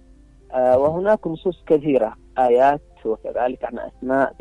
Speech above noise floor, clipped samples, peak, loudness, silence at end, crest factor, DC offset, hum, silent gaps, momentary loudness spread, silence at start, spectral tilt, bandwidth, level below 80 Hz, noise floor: 29 dB; under 0.1%; -4 dBFS; -20 LUFS; 0.1 s; 16 dB; under 0.1%; none; none; 11 LU; 0.5 s; -8 dB/octave; 10 kHz; -50 dBFS; -48 dBFS